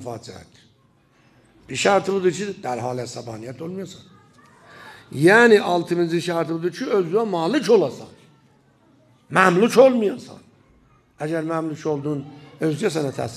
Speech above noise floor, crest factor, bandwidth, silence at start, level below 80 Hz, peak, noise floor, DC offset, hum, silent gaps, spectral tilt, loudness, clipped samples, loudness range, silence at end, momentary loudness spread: 38 dB; 22 dB; 13.5 kHz; 0 s; -64 dBFS; 0 dBFS; -59 dBFS; under 0.1%; none; none; -5.5 dB/octave; -20 LUFS; under 0.1%; 6 LU; 0 s; 20 LU